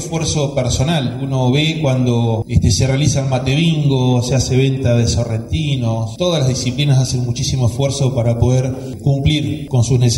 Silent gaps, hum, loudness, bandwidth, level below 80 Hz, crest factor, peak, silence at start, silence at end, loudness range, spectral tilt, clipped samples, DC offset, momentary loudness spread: none; none; -16 LUFS; 12.5 kHz; -32 dBFS; 14 dB; -2 dBFS; 0 s; 0 s; 2 LU; -5.5 dB/octave; under 0.1%; under 0.1%; 4 LU